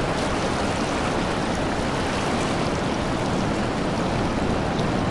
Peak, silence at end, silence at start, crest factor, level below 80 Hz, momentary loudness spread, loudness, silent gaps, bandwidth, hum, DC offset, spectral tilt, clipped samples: -12 dBFS; 0 s; 0 s; 12 dB; -36 dBFS; 1 LU; -24 LUFS; none; 11.5 kHz; none; under 0.1%; -5.5 dB/octave; under 0.1%